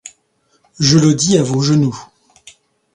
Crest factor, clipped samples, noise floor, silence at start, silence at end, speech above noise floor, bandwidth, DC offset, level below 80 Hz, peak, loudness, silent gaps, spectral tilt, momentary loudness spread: 16 dB; under 0.1%; -61 dBFS; 0.05 s; 0.9 s; 48 dB; 11 kHz; under 0.1%; -50 dBFS; 0 dBFS; -13 LUFS; none; -5 dB/octave; 8 LU